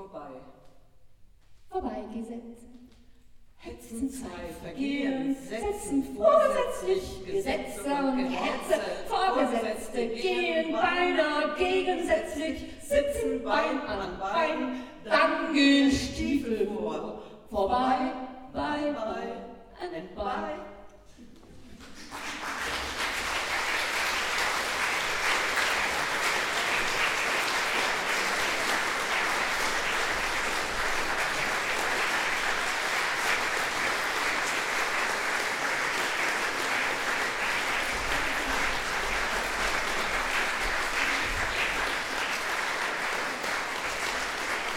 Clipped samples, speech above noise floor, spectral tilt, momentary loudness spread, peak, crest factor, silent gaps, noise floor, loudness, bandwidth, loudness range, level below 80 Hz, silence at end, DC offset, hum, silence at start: under 0.1%; 24 dB; -2.5 dB/octave; 10 LU; -10 dBFS; 20 dB; none; -52 dBFS; -28 LUFS; 17.5 kHz; 9 LU; -48 dBFS; 0 s; under 0.1%; none; 0 s